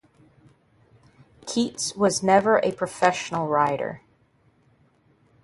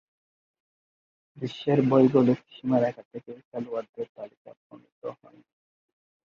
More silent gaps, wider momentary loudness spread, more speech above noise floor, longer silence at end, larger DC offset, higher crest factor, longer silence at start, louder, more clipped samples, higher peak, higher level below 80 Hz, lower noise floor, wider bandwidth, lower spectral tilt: second, none vs 3.05-3.11 s, 3.45-3.51 s, 3.89-3.93 s, 4.09-4.15 s, 4.37-4.45 s, 4.57-4.70 s, 4.92-5.02 s; second, 12 LU vs 22 LU; second, 40 dB vs over 63 dB; first, 1.45 s vs 1.15 s; neither; about the same, 22 dB vs 22 dB; about the same, 1.45 s vs 1.35 s; about the same, -23 LUFS vs -25 LUFS; neither; first, -4 dBFS vs -8 dBFS; first, -64 dBFS vs -70 dBFS; second, -62 dBFS vs under -90 dBFS; first, 11.5 kHz vs 6.8 kHz; second, -4 dB/octave vs -9 dB/octave